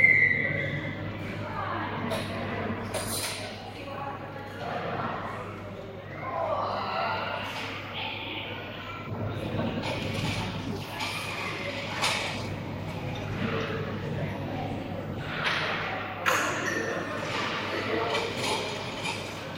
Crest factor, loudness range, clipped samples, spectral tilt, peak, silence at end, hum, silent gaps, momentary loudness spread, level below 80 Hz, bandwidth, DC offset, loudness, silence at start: 24 dB; 4 LU; under 0.1%; -4 dB/octave; -8 dBFS; 0 s; none; none; 9 LU; -54 dBFS; 16 kHz; under 0.1%; -31 LUFS; 0 s